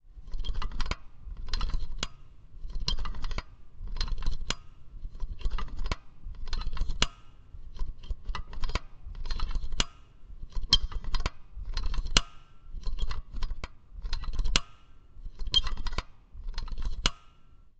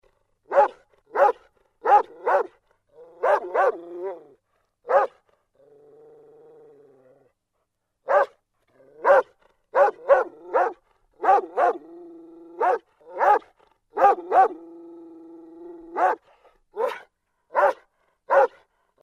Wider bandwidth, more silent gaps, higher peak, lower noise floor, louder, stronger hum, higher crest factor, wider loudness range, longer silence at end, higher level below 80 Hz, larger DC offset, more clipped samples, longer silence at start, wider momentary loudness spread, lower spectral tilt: second, 8.8 kHz vs 11 kHz; neither; about the same, -2 dBFS vs -4 dBFS; second, -53 dBFS vs -77 dBFS; second, -34 LUFS vs -22 LUFS; neither; first, 28 dB vs 20 dB; about the same, 7 LU vs 8 LU; second, 0.1 s vs 0.55 s; first, -32 dBFS vs -70 dBFS; neither; neither; second, 0.05 s vs 0.5 s; about the same, 21 LU vs 22 LU; second, -2.5 dB/octave vs -4 dB/octave